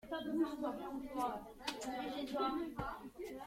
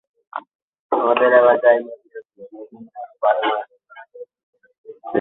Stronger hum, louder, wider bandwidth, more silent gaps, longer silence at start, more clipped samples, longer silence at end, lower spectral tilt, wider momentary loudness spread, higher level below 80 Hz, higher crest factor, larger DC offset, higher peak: neither; second, -42 LUFS vs -17 LUFS; first, 16.5 kHz vs 4 kHz; second, none vs 0.55-0.73 s, 0.79-0.90 s, 4.43-4.53 s, 4.78-4.84 s; second, 0.05 s vs 0.35 s; neither; about the same, 0 s vs 0 s; second, -4.5 dB/octave vs -8.5 dB/octave; second, 7 LU vs 26 LU; first, -64 dBFS vs -72 dBFS; about the same, 22 dB vs 18 dB; neither; second, -20 dBFS vs -2 dBFS